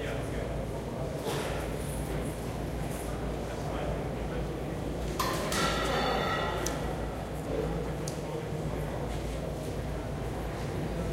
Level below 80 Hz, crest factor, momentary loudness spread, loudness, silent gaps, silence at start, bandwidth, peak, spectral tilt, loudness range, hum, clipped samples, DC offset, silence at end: -40 dBFS; 22 dB; 7 LU; -34 LUFS; none; 0 s; 16 kHz; -12 dBFS; -5 dB/octave; 4 LU; none; under 0.1%; under 0.1%; 0 s